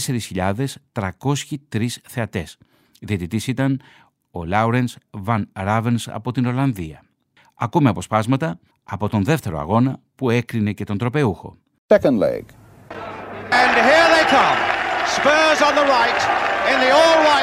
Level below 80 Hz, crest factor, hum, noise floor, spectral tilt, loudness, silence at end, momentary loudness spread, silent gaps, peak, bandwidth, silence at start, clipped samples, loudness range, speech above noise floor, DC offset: -50 dBFS; 18 dB; none; -58 dBFS; -5 dB/octave; -18 LUFS; 0 s; 17 LU; 11.78-11.89 s; 0 dBFS; 16 kHz; 0 s; under 0.1%; 10 LU; 39 dB; under 0.1%